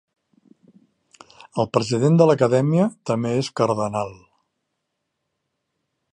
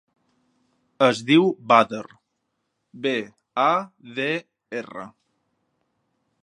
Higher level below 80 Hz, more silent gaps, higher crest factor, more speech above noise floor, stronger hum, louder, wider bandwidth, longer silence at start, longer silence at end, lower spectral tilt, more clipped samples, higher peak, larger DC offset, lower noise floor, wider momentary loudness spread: first, -62 dBFS vs -74 dBFS; neither; about the same, 20 dB vs 24 dB; first, 58 dB vs 54 dB; neither; about the same, -20 LUFS vs -22 LUFS; about the same, 10.5 kHz vs 11 kHz; first, 1.55 s vs 1 s; first, 2 s vs 1.35 s; first, -7 dB/octave vs -5.5 dB/octave; neither; about the same, -2 dBFS vs 0 dBFS; neither; about the same, -78 dBFS vs -76 dBFS; second, 11 LU vs 17 LU